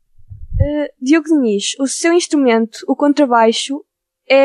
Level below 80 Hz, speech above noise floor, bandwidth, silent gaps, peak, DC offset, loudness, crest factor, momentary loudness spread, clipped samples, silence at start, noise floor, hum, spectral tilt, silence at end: -32 dBFS; 20 dB; 12 kHz; none; -2 dBFS; under 0.1%; -15 LUFS; 14 dB; 8 LU; under 0.1%; 0.3 s; -35 dBFS; none; -4.5 dB/octave; 0 s